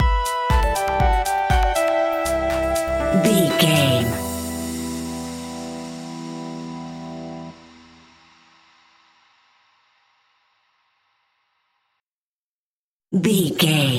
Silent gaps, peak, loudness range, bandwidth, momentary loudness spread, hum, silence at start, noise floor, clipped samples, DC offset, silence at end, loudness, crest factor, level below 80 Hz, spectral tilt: 12.08-13.00 s; -4 dBFS; 18 LU; 17 kHz; 16 LU; none; 0 s; under -90 dBFS; under 0.1%; under 0.1%; 0 s; -21 LUFS; 20 dB; -30 dBFS; -5 dB/octave